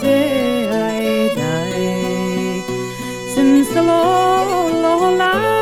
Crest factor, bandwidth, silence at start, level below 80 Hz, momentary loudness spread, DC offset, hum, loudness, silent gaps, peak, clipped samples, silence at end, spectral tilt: 12 dB; 16.5 kHz; 0 s; -48 dBFS; 8 LU; under 0.1%; none; -16 LUFS; none; -2 dBFS; under 0.1%; 0 s; -5 dB/octave